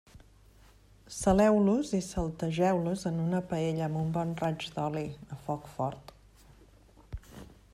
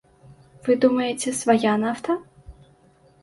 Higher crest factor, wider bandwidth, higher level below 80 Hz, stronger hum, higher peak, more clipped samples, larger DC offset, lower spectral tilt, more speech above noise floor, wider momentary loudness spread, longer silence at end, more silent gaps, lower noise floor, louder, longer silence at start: about the same, 18 dB vs 18 dB; first, 14 kHz vs 11.5 kHz; about the same, -52 dBFS vs -56 dBFS; neither; second, -12 dBFS vs -6 dBFS; neither; neither; first, -6.5 dB/octave vs -4.5 dB/octave; second, 29 dB vs 35 dB; first, 22 LU vs 9 LU; second, 0.2 s vs 0.7 s; neither; about the same, -58 dBFS vs -56 dBFS; second, -30 LUFS vs -22 LUFS; first, 1.1 s vs 0.65 s